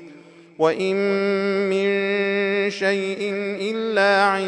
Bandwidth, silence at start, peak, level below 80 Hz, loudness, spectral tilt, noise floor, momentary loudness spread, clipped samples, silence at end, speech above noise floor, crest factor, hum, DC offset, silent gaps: 10 kHz; 0 s; -4 dBFS; -76 dBFS; -21 LUFS; -5 dB/octave; -45 dBFS; 7 LU; under 0.1%; 0 s; 25 dB; 16 dB; none; under 0.1%; none